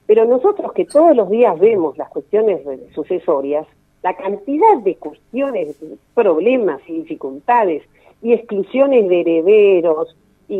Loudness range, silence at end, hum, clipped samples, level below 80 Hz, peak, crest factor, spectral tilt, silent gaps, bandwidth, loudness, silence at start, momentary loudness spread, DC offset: 4 LU; 0 s; none; under 0.1%; -62 dBFS; 0 dBFS; 14 dB; -7 dB/octave; none; 9.2 kHz; -15 LUFS; 0.1 s; 15 LU; under 0.1%